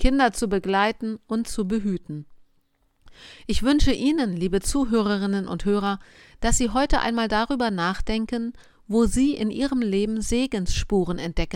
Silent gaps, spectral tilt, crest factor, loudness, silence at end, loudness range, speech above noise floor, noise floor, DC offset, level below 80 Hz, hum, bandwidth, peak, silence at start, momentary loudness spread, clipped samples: none; -4.5 dB/octave; 18 dB; -24 LUFS; 0 s; 3 LU; 43 dB; -65 dBFS; under 0.1%; -32 dBFS; none; 16.5 kHz; -4 dBFS; 0 s; 7 LU; under 0.1%